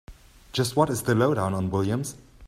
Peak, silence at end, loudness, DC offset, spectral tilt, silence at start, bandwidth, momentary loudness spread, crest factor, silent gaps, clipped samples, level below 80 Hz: -6 dBFS; 0 s; -25 LUFS; under 0.1%; -5.5 dB/octave; 0.1 s; 16 kHz; 8 LU; 20 dB; none; under 0.1%; -52 dBFS